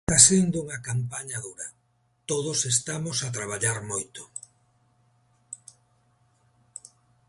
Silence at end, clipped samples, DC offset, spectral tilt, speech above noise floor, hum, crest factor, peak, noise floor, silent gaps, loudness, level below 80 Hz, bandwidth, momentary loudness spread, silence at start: 1.75 s; under 0.1%; under 0.1%; -3 dB/octave; 40 dB; none; 28 dB; 0 dBFS; -65 dBFS; none; -24 LUFS; -54 dBFS; 12 kHz; 24 LU; 0.1 s